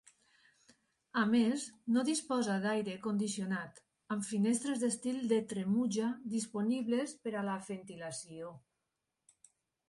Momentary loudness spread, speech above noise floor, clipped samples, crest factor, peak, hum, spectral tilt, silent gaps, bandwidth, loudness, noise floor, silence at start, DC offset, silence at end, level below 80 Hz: 12 LU; 53 dB; under 0.1%; 16 dB; -20 dBFS; none; -5 dB/octave; none; 11.5 kHz; -35 LUFS; -87 dBFS; 1.15 s; under 0.1%; 1.3 s; -78 dBFS